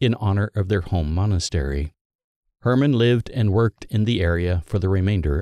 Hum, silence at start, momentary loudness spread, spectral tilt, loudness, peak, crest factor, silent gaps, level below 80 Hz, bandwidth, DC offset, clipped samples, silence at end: none; 0 s; 6 LU; -7 dB/octave; -21 LUFS; -6 dBFS; 14 dB; 2.01-2.43 s; -32 dBFS; 10 kHz; under 0.1%; under 0.1%; 0 s